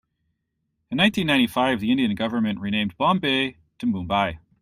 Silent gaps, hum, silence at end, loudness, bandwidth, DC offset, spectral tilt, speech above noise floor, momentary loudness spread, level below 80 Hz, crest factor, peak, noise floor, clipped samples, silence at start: none; none; 0.25 s; -22 LUFS; 15.5 kHz; under 0.1%; -5.5 dB/octave; 54 dB; 8 LU; -54 dBFS; 18 dB; -6 dBFS; -76 dBFS; under 0.1%; 0.9 s